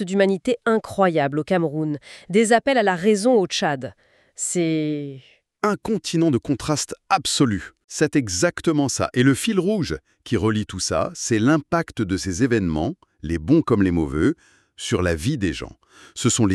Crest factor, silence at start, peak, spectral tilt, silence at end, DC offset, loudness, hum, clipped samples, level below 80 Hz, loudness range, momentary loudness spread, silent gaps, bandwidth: 18 dB; 0 s; -4 dBFS; -5 dB/octave; 0 s; under 0.1%; -21 LUFS; none; under 0.1%; -44 dBFS; 3 LU; 10 LU; 7.84-7.88 s; 13 kHz